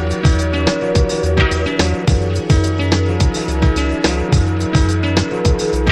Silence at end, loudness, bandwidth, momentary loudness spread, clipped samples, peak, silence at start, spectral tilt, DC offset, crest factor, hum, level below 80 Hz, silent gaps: 0 s; -16 LUFS; 11.5 kHz; 2 LU; under 0.1%; 0 dBFS; 0 s; -6 dB/octave; 0.2%; 14 dB; none; -20 dBFS; none